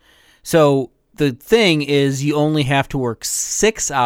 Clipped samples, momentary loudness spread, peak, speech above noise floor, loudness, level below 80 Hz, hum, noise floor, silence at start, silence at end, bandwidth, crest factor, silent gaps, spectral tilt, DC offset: under 0.1%; 7 LU; 0 dBFS; 23 dB; -17 LUFS; -44 dBFS; none; -39 dBFS; 0.45 s; 0 s; 17 kHz; 16 dB; none; -4 dB/octave; under 0.1%